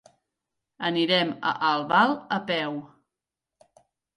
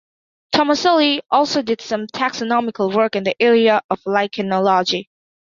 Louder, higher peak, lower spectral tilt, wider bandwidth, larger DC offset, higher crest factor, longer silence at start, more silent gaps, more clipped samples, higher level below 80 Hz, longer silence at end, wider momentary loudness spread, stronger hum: second, -24 LUFS vs -17 LUFS; second, -8 dBFS vs -2 dBFS; about the same, -5.5 dB/octave vs -4.5 dB/octave; first, 11.5 kHz vs 7.4 kHz; neither; about the same, 20 dB vs 16 dB; first, 0.8 s vs 0.5 s; second, none vs 3.84-3.89 s; neither; second, -74 dBFS vs -64 dBFS; first, 1.3 s vs 0.55 s; about the same, 9 LU vs 7 LU; neither